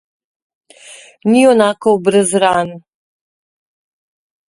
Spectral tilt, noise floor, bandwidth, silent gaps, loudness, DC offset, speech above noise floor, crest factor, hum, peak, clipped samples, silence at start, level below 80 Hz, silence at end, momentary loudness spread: -4.5 dB/octave; -40 dBFS; 11.5 kHz; none; -12 LUFS; under 0.1%; 28 dB; 16 dB; none; 0 dBFS; under 0.1%; 0.9 s; -58 dBFS; 1.7 s; 9 LU